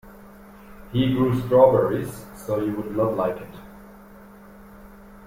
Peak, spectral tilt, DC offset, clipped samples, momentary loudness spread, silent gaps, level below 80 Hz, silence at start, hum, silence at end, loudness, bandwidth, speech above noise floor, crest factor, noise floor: -2 dBFS; -7.5 dB/octave; under 0.1%; under 0.1%; 19 LU; none; -50 dBFS; 0.05 s; none; 0 s; -22 LUFS; 16.5 kHz; 25 dB; 22 dB; -46 dBFS